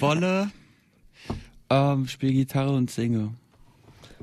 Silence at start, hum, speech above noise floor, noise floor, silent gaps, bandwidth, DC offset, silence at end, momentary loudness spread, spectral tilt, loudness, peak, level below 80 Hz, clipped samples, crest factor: 0 s; none; 34 dB; -58 dBFS; none; 13.5 kHz; under 0.1%; 0.1 s; 15 LU; -7 dB/octave; -25 LUFS; -10 dBFS; -52 dBFS; under 0.1%; 16 dB